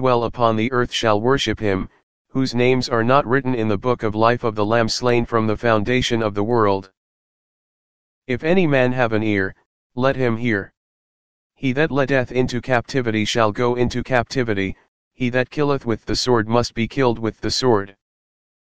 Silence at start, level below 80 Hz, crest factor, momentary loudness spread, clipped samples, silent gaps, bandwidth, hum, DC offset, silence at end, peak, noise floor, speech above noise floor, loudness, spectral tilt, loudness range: 0 s; -44 dBFS; 20 dB; 6 LU; under 0.1%; 2.03-2.25 s, 6.97-8.22 s, 9.66-9.90 s, 10.77-11.50 s, 14.88-15.11 s; 9.6 kHz; none; 2%; 0.7 s; 0 dBFS; under -90 dBFS; over 71 dB; -20 LUFS; -5.5 dB/octave; 3 LU